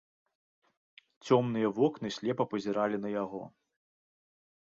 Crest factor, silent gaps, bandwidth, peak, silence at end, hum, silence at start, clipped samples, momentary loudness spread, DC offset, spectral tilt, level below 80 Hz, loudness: 22 dB; none; 7.8 kHz; -12 dBFS; 1.2 s; none; 1.25 s; under 0.1%; 14 LU; under 0.1%; -6.5 dB/octave; -76 dBFS; -31 LUFS